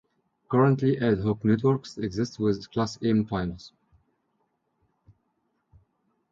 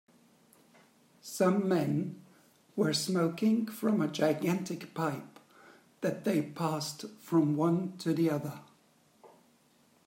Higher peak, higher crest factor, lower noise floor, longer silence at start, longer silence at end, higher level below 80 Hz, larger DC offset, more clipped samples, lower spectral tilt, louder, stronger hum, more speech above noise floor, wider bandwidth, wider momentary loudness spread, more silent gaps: first, -10 dBFS vs -16 dBFS; about the same, 18 dB vs 18 dB; first, -75 dBFS vs -66 dBFS; second, 0.5 s vs 1.25 s; first, 2.65 s vs 0.8 s; first, -54 dBFS vs -80 dBFS; neither; neither; first, -7.5 dB/octave vs -6 dB/octave; first, -26 LUFS vs -31 LUFS; neither; first, 50 dB vs 36 dB; second, 7.6 kHz vs 16 kHz; second, 9 LU vs 14 LU; neither